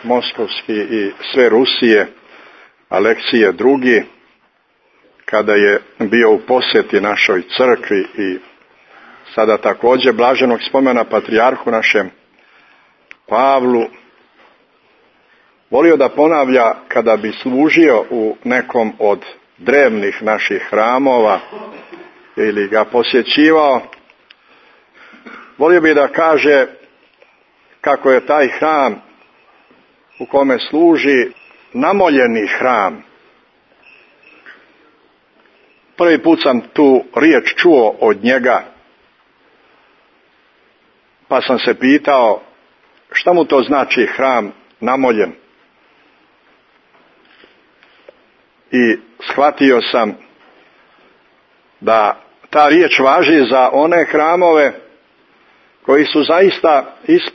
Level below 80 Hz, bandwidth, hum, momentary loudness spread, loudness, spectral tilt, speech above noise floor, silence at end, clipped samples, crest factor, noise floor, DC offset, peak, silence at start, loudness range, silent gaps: -62 dBFS; 6.4 kHz; none; 9 LU; -13 LUFS; -5.5 dB/octave; 45 dB; 0.05 s; under 0.1%; 14 dB; -57 dBFS; under 0.1%; 0 dBFS; 0.05 s; 6 LU; none